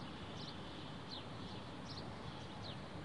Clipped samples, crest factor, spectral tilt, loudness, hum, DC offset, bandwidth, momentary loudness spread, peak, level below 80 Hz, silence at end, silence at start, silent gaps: under 0.1%; 14 dB; -5.5 dB/octave; -49 LUFS; none; 0.1%; 11 kHz; 1 LU; -36 dBFS; -66 dBFS; 0 s; 0 s; none